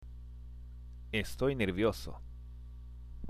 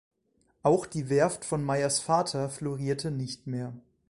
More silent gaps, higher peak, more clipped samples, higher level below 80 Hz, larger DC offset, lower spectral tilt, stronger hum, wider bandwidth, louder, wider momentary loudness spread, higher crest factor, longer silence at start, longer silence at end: neither; second, -18 dBFS vs -10 dBFS; neither; first, -48 dBFS vs -60 dBFS; neither; about the same, -6 dB/octave vs -5 dB/octave; first, 60 Hz at -45 dBFS vs none; first, 15.5 kHz vs 11.5 kHz; second, -34 LUFS vs -29 LUFS; first, 19 LU vs 9 LU; about the same, 20 dB vs 18 dB; second, 0 s vs 0.65 s; second, 0 s vs 0.3 s